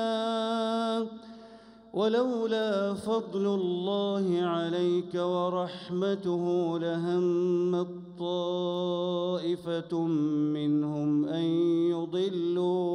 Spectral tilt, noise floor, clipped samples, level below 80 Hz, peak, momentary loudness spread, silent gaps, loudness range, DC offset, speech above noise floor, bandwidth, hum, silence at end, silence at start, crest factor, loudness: -7.5 dB/octave; -51 dBFS; under 0.1%; -72 dBFS; -16 dBFS; 5 LU; none; 2 LU; under 0.1%; 23 dB; 10.5 kHz; none; 0 s; 0 s; 12 dB; -29 LUFS